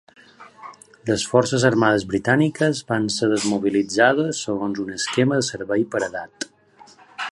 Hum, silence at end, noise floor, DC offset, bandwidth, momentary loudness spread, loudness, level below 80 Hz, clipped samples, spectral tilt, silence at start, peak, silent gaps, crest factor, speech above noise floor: none; 0.05 s; -50 dBFS; under 0.1%; 11.5 kHz; 16 LU; -20 LUFS; -56 dBFS; under 0.1%; -4.5 dB/octave; 0.4 s; -2 dBFS; none; 20 dB; 30 dB